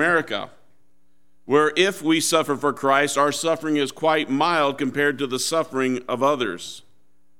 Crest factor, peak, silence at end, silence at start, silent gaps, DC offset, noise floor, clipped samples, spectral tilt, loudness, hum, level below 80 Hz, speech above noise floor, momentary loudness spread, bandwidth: 18 dB; -4 dBFS; 0.6 s; 0 s; none; 0.5%; -69 dBFS; under 0.1%; -3.5 dB/octave; -21 LUFS; none; -72 dBFS; 47 dB; 9 LU; 16.5 kHz